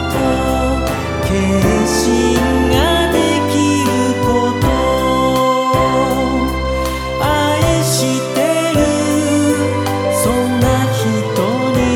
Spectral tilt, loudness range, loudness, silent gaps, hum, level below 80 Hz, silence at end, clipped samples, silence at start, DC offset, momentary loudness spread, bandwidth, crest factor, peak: -5 dB/octave; 1 LU; -14 LUFS; none; none; -26 dBFS; 0 s; under 0.1%; 0 s; under 0.1%; 4 LU; 18.5 kHz; 14 dB; 0 dBFS